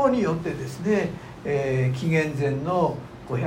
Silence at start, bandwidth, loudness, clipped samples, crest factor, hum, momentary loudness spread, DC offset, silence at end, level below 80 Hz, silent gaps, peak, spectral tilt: 0 s; 16 kHz; -25 LUFS; under 0.1%; 16 dB; none; 9 LU; under 0.1%; 0 s; -52 dBFS; none; -8 dBFS; -7.5 dB/octave